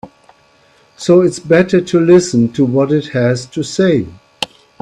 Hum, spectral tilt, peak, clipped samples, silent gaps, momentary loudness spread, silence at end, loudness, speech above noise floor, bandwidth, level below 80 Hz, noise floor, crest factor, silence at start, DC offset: none; -6 dB/octave; 0 dBFS; under 0.1%; none; 14 LU; 0.35 s; -13 LUFS; 38 dB; 11 kHz; -50 dBFS; -50 dBFS; 14 dB; 0.05 s; under 0.1%